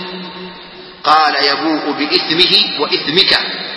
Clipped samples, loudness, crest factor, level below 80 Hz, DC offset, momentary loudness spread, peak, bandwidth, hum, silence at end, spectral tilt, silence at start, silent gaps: 0.2%; -12 LUFS; 14 dB; -54 dBFS; under 0.1%; 19 LU; 0 dBFS; 11 kHz; none; 0 s; -4 dB/octave; 0 s; none